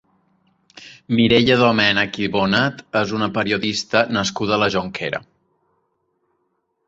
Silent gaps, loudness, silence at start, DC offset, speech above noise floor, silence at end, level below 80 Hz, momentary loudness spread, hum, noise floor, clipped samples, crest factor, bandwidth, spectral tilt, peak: none; -18 LUFS; 0.75 s; under 0.1%; 52 dB; 1.7 s; -52 dBFS; 9 LU; none; -70 dBFS; under 0.1%; 18 dB; 8 kHz; -5 dB/octave; -2 dBFS